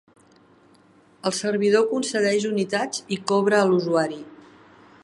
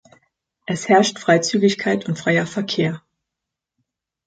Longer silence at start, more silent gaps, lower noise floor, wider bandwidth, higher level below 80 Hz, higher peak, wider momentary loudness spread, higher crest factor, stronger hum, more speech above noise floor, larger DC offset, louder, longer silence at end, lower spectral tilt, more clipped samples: first, 1.25 s vs 0.7 s; neither; second, -55 dBFS vs -84 dBFS; first, 11.5 kHz vs 9.2 kHz; second, -72 dBFS vs -64 dBFS; second, -6 dBFS vs -2 dBFS; about the same, 9 LU vs 11 LU; about the same, 18 dB vs 18 dB; neither; second, 34 dB vs 65 dB; neither; second, -22 LUFS vs -19 LUFS; second, 0.7 s vs 1.3 s; about the same, -4.5 dB/octave vs -4.5 dB/octave; neither